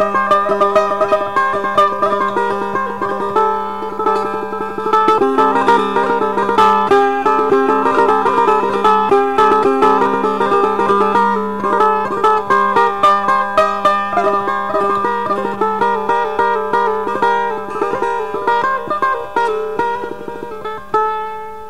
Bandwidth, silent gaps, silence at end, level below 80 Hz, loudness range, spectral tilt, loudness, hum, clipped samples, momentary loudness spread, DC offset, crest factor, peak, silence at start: 15 kHz; none; 0 s; -50 dBFS; 4 LU; -5.5 dB/octave; -14 LUFS; none; under 0.1%; 8 LU; 2%; 12 dB; -2 dBFS; 0 s